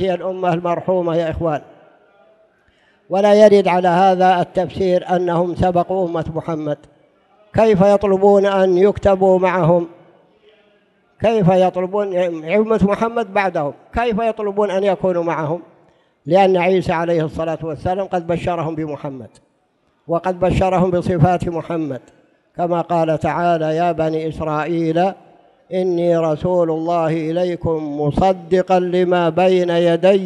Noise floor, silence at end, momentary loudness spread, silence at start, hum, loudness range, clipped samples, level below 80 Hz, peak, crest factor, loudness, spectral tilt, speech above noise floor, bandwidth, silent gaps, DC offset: -62 dBFS; 0 s; 10 LU; 0 s; none; 5 LU; under 0.1%; -42 dBFS; 0 dBFS; 16 dB; -17 LUFS; -7.5 dB/octave; 46 dB; 11 kHz; none; under 0.1%